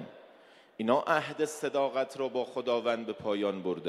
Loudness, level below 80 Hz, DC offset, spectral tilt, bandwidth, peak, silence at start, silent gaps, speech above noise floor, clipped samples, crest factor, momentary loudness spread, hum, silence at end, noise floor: -31 LUFS; -76 dBFS; under 0.1%; -4.5 dB/octave; 14 kHz; -12 dBFS; 0 s; none; 27 dB; under 0.1%; 20 dB; 6 LU; none; 0 s; -58 dBFS